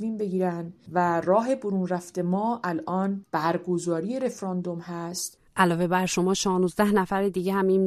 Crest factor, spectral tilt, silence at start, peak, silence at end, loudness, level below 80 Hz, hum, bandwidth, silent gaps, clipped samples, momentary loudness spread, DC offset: 20 dB; -5.5 dB/octave; 0 s; -6 dBFS; 0 s; -26 LUFS; -60 dBFS; none; 13.5 kHz; none; under 0.1%; 8 LU; under 0.1%